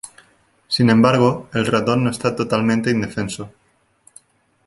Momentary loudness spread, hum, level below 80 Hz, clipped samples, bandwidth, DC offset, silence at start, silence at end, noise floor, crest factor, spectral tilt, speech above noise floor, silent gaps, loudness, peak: 14 LU; none; -52 dBFS; under 0.1%; 11.5 kHz; under 0.1%; 0.05 s; 1.2 s; -56 dBFS; 18 dB; -6 dB/octave; 39 dB; none; -18 LUFS; -2 dBFS